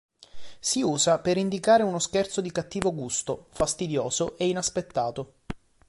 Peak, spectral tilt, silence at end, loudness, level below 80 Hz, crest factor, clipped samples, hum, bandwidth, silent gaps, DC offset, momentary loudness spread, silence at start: -4 dBFS; -3.5 dB/octave; 0.3 s; -26 LUFS; -52 dBFS; 22 dB; under 0.1%; none; 11.5 kHz; none; under 0.1%; 10 LU; 0.35 s